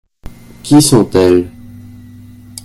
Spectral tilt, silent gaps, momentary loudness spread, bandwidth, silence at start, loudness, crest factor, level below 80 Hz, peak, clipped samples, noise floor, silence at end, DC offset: -5.5 dB/octave; none; 21 LU; 13.5 kHz; 0.65 s; -10 LUFS; 14 dB; -40 dBFS; 0 dBFS; 0.1%; -35 dBFS; 1.15 s; under 0.1%